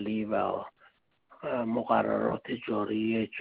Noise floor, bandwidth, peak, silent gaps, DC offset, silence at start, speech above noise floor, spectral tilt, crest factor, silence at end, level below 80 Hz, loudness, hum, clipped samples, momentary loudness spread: -64 dBFS; 4.5 kHz; -12 dBFS; none; under 0.1%; 0 s; 34 dB; -5 dB/octave; 18 dB; 0 s; -66 dBFS; -30 LUFS; none; under 0.1%; 9 LU